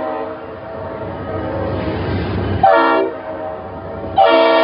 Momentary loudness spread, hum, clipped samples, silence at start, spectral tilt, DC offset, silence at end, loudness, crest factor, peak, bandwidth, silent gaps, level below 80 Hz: 17 LU; none; under 0.1%; 0 s; -10 dB/octave; under 0.1%; 0 s; -17 LUFS; 16 dB; 0 dBFS; 5.4 kHz; none; -38 dBFS